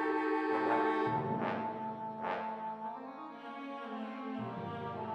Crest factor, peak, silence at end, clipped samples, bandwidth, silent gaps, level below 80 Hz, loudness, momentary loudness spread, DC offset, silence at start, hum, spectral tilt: 18 dB; -18 dBFS; 0 s; under 0.1%; 8.6 kHz; none; -76 dBFS; -37 LUFS; 13 LU; under 0.1%; 0 s; none; -7.5 dB/octave